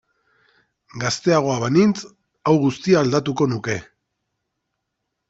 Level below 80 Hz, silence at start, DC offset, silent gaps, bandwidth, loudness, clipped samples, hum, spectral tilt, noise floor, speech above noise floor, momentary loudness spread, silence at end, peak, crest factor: -58 dBFS; 0.95 s; under 0.1%; none; 8 kHz; -20 LUFS; under 0.1%; none; -6 dB/octave; -78 dBFS; 59 dB; 10 LU; 1.45 s; -4 dBFS; 18 dB